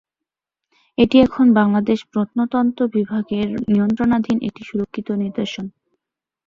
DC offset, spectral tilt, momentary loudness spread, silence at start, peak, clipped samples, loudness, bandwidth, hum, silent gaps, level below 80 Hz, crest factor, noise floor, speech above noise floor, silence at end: under 0.1%; -7.5 dB/octave; 12 LU; 1 s; -2 dBFS; under 0.1%; -18 LUFS; 7.2 kHz; none; none; -50 dBFS; 16 dB; -86 dBFS; 68 dB; 0.75 s